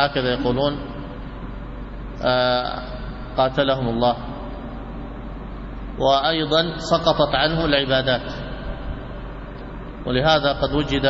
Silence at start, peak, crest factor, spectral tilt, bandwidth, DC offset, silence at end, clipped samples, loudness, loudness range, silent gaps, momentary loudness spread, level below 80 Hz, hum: 0 s; -4 dBFS; 18 dB; -6 dB/octave; 8 kHz; under 0.1%; 0 s; under 0.1%; -21 LUFS; 4 LU; none; 16 LU; -34 dBFS; none